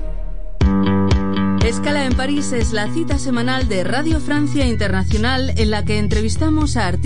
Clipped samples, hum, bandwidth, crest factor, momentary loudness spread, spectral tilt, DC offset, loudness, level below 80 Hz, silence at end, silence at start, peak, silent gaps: under 0.1%; none; 10.5 kHz; 14 dB; 3 LU; -5.5 dB/octave; 8%; -18 LUFS; -24 dBFS; 0 s; 0 s; -4 dBFS; none